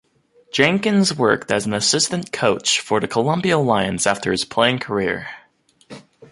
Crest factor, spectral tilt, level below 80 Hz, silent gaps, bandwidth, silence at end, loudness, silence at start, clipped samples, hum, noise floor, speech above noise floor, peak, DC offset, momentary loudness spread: 18 dB; -3.5 dB/octave; -54 dBFS; none; 11.5 kHz; 0.05 s; -18 LUFS; 0.55 s; under 0.1%; none; -56 dBFS; 37 dB; -2 dBFS; under 0.1%; 5 LU